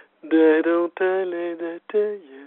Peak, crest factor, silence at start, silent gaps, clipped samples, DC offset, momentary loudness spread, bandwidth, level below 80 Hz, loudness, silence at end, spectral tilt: -6 dBFS; 16 dB; 0.25 s; none; under 0.1%; under 0.1%; 11 LU; 4.1 kHz; -76 dBFS; -21 LUFS; 0 s; -3 dB/octave